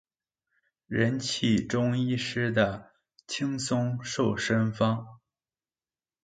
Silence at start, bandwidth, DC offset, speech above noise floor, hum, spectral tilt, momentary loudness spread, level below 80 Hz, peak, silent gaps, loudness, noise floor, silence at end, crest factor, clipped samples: 0.9 s; 9.4 kHz; under 0.1%; over 63 dB; none; -5.5 dB/octave; 6 LU; -58 dBFS; -10 dBFS; none; -28 LUFS; under -90 dBFS; 1.1 s; 20 dB; under 0.1%